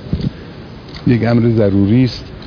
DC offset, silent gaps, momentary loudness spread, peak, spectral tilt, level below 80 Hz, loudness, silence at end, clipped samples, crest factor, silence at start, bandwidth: under 0.1%; none; 20 LU; -2 dBFS; -9 dB/octave; -34 dBFS; -14 LUFS; 0 s; under 0.1%; 14 dB; 0 s; 5.4 kHz